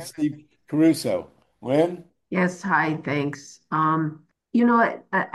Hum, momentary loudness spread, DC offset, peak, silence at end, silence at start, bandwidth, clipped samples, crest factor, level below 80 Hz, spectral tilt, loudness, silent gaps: none; 11 LU; under 0.1%; -6 dBFS; 0.05 s; 0 s; 12.5 kHz; under 0.1%; 18 dB; -68 dBFS; -6.5 dB/octave; -23 LUFS; none